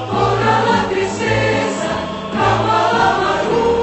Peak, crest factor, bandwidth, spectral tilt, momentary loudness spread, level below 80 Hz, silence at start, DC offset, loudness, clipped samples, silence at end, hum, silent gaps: -2 dBFS; 14 dB; 8.4 kHz; -5 dB/octave; 6 LU; -40 dBFS; 0 s; under 0.1%; -16 LUFS; under 0.1%; 0 s; none; none